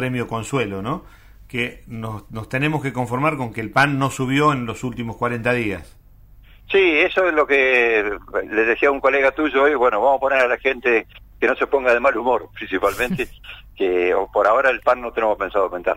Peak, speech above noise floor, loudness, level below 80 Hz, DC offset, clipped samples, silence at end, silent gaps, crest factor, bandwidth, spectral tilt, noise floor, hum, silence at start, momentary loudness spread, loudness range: -4 dBFS; 27 dB; -19 LUFS; -46 dBFS; under 0.1%; under 0.1%; 0 s; none; 16 dB; 16 kHz; -5.5 dB/octave; -46 dBFS; none; 0 s; 11 LU; 5 LU